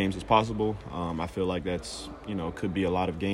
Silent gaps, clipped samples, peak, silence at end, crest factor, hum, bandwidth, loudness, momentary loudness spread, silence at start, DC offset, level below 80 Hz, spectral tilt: none; under 0.1%; -6 dBFS; 0 s; 22 dB; none; 12.5 kHz; -30 LUFS; 10 LU; 0 s; under 0.1%; -48 dBFS; -6 dB/octave